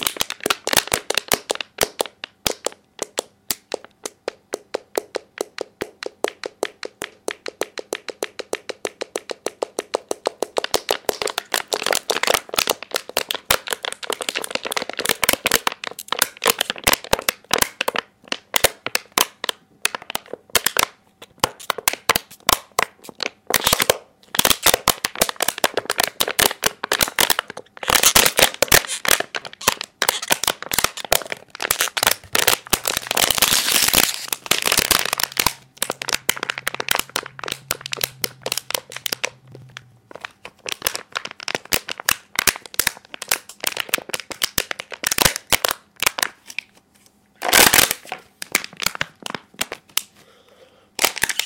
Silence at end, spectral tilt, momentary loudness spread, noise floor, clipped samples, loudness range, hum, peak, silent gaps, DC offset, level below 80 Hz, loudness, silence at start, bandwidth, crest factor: 0 s; -0.5 dB/octave; 15 LU; -56 dBFS; under 0.1%; 12 LU; none; 0 dBFS; none; under 0.1%; -48 dBFS; -20 LUFS; 0 s; over 20 kHz; 22 dB